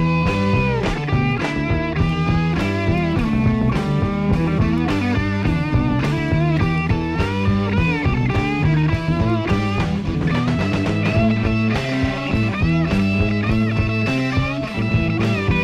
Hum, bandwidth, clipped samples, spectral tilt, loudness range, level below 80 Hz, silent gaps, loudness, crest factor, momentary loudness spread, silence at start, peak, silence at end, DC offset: none; 9.8 kHz; under 0.1%; -7.5 dB/octave; 1 LU; -30 dBFS; none; -19 LUFS; 14 dB; 3 LU; 0 s; -4 dBFS; 0 s; under 0.1%